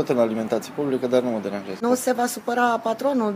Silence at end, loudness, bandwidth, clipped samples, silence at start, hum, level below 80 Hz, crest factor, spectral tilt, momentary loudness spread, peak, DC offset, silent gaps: 0 s; -23 LUFS; 15.5 kHz; under 0.1%; 0 s; none; -68 dBFS; 16 dB; -4.5 dB/octave; 5 LU; -6 dBFS; under 0.1%; none